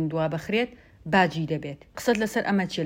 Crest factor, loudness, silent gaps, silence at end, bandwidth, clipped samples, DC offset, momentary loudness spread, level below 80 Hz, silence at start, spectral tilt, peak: 20 dB; -26 LUFS; none; 0 s; 16 kHz; under 0.1%; under 0.1%; 10 LU; -56 dBFS; 0 s; -5.5 dB/octave; -6 dBFS